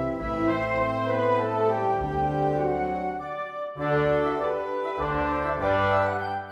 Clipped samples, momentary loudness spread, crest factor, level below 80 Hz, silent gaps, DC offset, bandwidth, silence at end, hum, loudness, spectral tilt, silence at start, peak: under 0.1%; 7 LU; 14 dB; -44 dBFS; none; under 0.1%; 11.5 kHz; 0 s; none; -26 LUFS; -8 dB/octave; 0 s; -12 dBFS